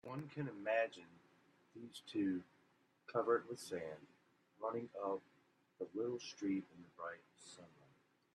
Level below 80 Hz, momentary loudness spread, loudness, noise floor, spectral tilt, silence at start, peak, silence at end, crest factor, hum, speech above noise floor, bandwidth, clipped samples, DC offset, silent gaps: -88 dBFS; 20 LU; -43 LUFS; -76 dBFS; -5.5 dB/octave; 0.05 s; -24 dBFS; 0.7 s; 22 dB; none; 32 dB; 12.5 kHz; under 0.1%; under 0.1%; none